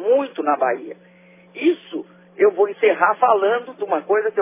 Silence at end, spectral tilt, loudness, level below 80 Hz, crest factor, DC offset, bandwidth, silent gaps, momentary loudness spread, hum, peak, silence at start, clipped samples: 0 s; -8 dB/octave; -19 LUFS; -82 dBFS; 18 dB; under 0.1%; 3.8 kHz; none; 14 LU; none; -2 dBFS; 0 s; under 0.1%